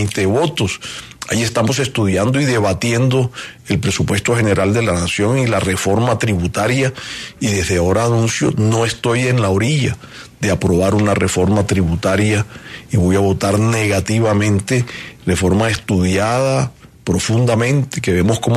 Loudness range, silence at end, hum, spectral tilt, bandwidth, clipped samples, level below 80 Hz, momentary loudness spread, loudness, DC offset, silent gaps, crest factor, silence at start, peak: 1 LU; 0 s; none; -5.5 dB/octave; 13.5 kHz; under 0.1%; -38 dBFS; 7 LU; -16 LUFS; under 0.1%; none; 14 dB; 0 s; -2 dBFS